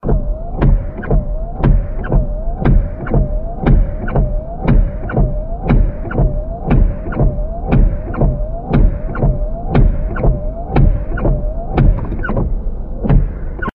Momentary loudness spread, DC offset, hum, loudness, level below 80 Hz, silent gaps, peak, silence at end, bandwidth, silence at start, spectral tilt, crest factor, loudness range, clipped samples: 7 LU; under 0.1%; none; -18 LUFS; -16 dBFS; none; 0 dBFS; 0.05 s; 4 kHz; 0.05 s; -11.5 dB/octave; 14 dB; 1 LU; under 0.1%